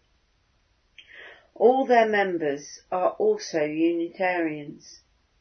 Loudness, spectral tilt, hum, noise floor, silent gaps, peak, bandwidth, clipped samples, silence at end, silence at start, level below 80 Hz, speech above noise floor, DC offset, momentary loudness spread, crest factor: -24 LUFS; -5 dB/octave; none; -67 dBFS; none; -6 dBFS; 6.6 kHz; under 0.1%; 0.5 s; 1.15 s; -70 dBFS; 43 dB; under 0.1%; 19 LU; 20 dB